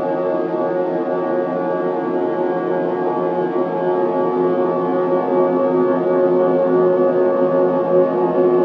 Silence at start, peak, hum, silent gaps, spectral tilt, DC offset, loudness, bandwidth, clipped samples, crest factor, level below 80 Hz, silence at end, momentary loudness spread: 0 s; -4 dBFS; none; none; -10 dB/octave; under 0.1%; -18 LUFS; 4.9 kHz; under 0.1%; 14 dB; -70 dBFS; 0 s; 5 LU